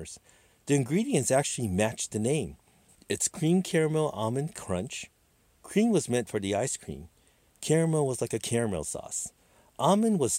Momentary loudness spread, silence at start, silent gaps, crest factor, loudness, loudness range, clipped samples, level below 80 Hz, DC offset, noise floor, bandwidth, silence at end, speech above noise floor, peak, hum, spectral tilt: 14 LU; 0 s; none; 18 dB; -28 LUFS; 3 LU; under 0.1%; -62 dBFS; under 0.1%; -66 dBFS; 16 kHz; 0 s; 38 dB; -10 dBFS; none; -5 dB/octave